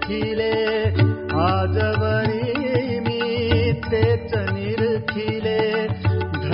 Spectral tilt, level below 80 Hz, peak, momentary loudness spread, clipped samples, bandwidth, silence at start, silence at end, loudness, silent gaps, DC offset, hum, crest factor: -11.5 dB/octave; -44 dBFS; -4 dBFS; 4 LU; under 0.1%; 5.6 kHz; 0 s; 0 s; -21 LUFS; none; under 0.1%; none; 16 dB